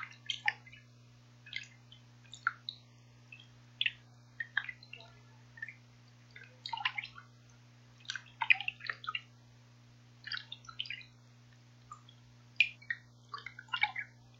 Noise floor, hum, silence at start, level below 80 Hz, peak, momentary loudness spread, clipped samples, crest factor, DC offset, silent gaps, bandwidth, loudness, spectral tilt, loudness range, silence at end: -60 dBFS; 60 Hz at -60 dBFS; 0 s; -76 dBFS; -8 dBFS; 25 LU; under 0.1%; 34 dB; under 0.1%; none; 16 kHz; -37 LUFS; -1.5 dB/octave; 8 LU; 0 s